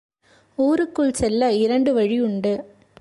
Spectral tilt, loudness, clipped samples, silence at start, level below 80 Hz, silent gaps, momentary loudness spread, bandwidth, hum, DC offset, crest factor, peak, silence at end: -5.5 dB/octave; -20 LUFS; under 0.1%; 0.6 s; -48 dBFS; none; 6 LU; 11.5 kHz; none; under 0.1%; 12 dB; -8 dBFS; 0.35 s